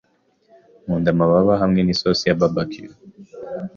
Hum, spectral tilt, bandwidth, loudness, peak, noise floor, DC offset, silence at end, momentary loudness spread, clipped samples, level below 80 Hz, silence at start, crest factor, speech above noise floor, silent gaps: none; -6.5 dB/octave; 7.2 kHz; -18 LUFS; -4 dBFS; -61 dBFS; under 0.1%; 0.1 s; 19 LU; under 0.1%; -46 dBFS; 0.85 s; 16 dB; 43 dB; none